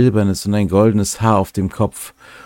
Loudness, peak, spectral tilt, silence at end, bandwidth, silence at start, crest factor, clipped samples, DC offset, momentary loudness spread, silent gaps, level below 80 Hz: -16 LUFS; 0 dBFS; -6.5 dB/octave; 0.1 s; 17 kHz; 0 s; 16 dB; under 0.1%; under 0.1%; 8 LU; none; -42 dBFS